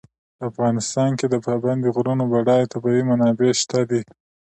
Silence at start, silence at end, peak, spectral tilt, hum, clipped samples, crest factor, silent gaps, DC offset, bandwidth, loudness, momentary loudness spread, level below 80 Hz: 0.4 s; 0.5 s; -6 dBFS; -5.5 dB/octave; none; under 0.1%; 14 dB; none; under 0.1%; 9 kHz; -20 LUFS; 6 LU; -62 dBFS